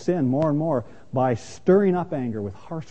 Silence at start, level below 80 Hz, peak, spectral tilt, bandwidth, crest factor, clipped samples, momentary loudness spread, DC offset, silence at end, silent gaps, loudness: 0 s; -56 dBFS; -6 dBFS; -8.5 dB/octave; 8.6 kHz; 16 dB; under 0.1%; 12 LU; 0.7%; 0.05 s; none; -23 LUFS